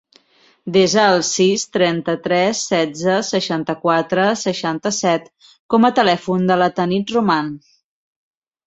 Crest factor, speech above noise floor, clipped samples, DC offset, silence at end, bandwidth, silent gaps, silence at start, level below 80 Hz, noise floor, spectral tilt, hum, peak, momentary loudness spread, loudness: 16 dB; 38 dB; under 0.1%; under 0.1%; 1.1 s; 8.2 kHz; 5.59-5.69 s; 0.65 s; -60 dBFS; -55 dBFS; -4 dB/octave; none; -2 dBFS; 7 LU; -17 LUFS